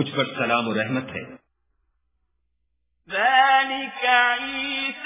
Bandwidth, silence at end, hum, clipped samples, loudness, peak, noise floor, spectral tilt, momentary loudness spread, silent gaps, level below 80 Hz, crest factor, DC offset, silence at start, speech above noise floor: 3.9 kHz; 0 s; none; under 0.1%; -21 LUFS; -4 dBFS; -75 dBFS; -7.5 dB/octave; 12 LU; none; -64 dBFS; 20 dB; under 0.1%; 0 s; 52 dB